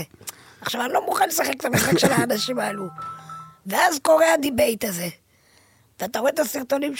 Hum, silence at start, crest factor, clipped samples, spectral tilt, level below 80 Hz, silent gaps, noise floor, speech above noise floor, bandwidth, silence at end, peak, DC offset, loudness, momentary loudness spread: none; 0 s; 18 dB; under 0.1%; -3.5 dB/octave; -56 dBFS; none; -58 dBFS; 36 dB; 17 kHz; 0 s; -4 dBFS; under 0.1%; -21 LUFS; 18 LU